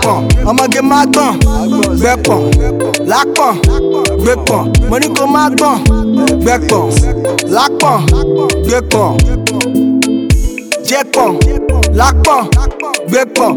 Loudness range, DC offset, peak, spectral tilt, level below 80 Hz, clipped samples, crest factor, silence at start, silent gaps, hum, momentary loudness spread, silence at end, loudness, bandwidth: 1 LU; under 0.1%; 0 dBFS; -5 dB/octave; -16 dBFS; under 0.1%; 10 dB; 0 s; none; none; 4 LU; 0 s; -11 LUFS; 19 kHz